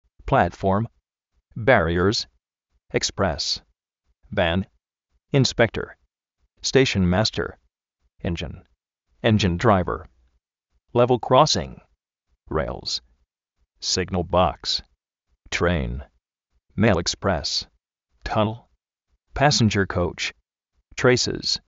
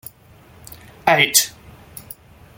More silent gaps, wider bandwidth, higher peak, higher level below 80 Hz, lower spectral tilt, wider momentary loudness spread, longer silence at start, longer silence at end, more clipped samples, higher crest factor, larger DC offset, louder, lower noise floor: neither; second, 8 kHz vs 17 kHz; about the same, -2 dBFS vs 0 dBFS; first, -42 dBFS vs -54 dBFS; first, -4 dB/octave vs -1 dB/octave; second, 14 LU vs 26 LU; second, 0.25 s vs 0.7 s; second, 0.1 s vs 0.55 s; neither; about the same, 22 dB vs 22 dB; neither; second, -22 LUFS vs -16 LUFS; first, -73 dBFS vs -48 dBFS